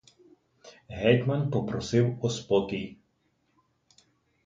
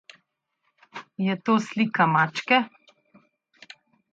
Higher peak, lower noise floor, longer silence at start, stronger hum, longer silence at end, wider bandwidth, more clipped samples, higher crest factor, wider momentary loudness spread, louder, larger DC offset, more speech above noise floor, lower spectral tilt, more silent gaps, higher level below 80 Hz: about the same, -8 dBFS vs -8 dBFS; about the same, -72 dBFS vs -75 dBFS; second, 0.65 s vs 0.95 s; neither; about the same, 1.55 s vs 1.45 s; about the same, 7.8 kHz vs 7.8 kHz; neither; about the same, 22 dB vs 18 dB; second, 12 LU vs 20 LU; second, -27 LUFS vs -23 LUFS; neither; second, 46 dB vs 52 dB; about the same, -6.5 dB/octave vs -5.5 dB/octave; neither; first, -58 dBFS vs -76 dBFS